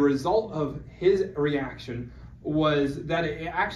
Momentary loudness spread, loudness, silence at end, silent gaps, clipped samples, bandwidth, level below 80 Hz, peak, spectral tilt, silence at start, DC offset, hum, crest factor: 13 LU; -27 LUFS; 0 s; none; under 0.1%; 12 kHz; -48 dBFS; -10 dBFS; -7 dB/octave; 0 s; under 0.1%; none; 16 dB